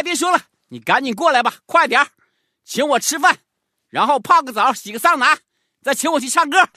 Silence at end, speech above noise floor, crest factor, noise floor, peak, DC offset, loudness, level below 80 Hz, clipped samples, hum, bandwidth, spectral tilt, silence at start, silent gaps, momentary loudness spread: 0.1 s; 48 dB; 18 dB; -65 dBFS; 0 dBFS; under 0.1%; -17 LUFS; -70 dBFS; under 0.1%; none; 14 kHz; -1.5 dB/octave; 0 s; none; 8 LU